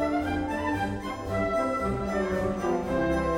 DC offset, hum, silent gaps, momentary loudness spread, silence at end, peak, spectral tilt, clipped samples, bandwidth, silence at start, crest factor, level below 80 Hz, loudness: under 0.1%; none; none; 3 LU; 0 s; -16 dBFS; -6.5 dB/octave; under 0.1%; 16.5 kHz; 0 s; 12 dB; -42 dBFS; -28 LUFS